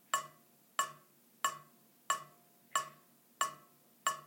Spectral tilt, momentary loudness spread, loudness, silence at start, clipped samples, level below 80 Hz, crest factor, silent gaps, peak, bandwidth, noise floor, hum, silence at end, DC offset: 0.5 dB/octave; 16 LU; -39 LUFS; 0.15 s; under 0.1%; under -90 dBFS; 26 dB; none; -16 dBFS; 17 kHz; -65 dBFS; none; 0 s; under 0.1%